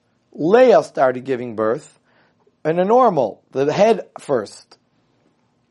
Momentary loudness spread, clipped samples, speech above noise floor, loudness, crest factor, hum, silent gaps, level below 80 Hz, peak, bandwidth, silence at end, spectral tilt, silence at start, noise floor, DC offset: 11 LU; under 0.1%; 45 dB; -17 LUFS; 18 dB; none; none; -70 dBFS; 0 dBFS; 11.5 kHz; 1.2 s; -6.5 dB/octave; 0.35 s; -62 dBFS; under 0.1%